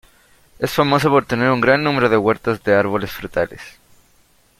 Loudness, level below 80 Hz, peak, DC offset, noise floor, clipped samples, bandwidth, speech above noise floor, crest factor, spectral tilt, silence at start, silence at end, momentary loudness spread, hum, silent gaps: -17 LUFS; -48 dBFS; -2 dBFS; under 0.1%; -55 dBFS; under 0.1%; 16.5 kHz; 38 dB; 18 dB; -6 dB/octave; 0.6 s; 0.9 s; 9 LU; none; none